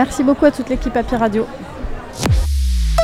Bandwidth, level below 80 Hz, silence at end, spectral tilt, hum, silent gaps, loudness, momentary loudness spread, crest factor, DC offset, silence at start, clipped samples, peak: 15.5 kHz; -22 dBFS; 0 s; -6 dB/octave; none; none; -17 LUFS; 15 LU; 16 dB; under 0.1%; 0 s; under 0.1%; 0 dBFS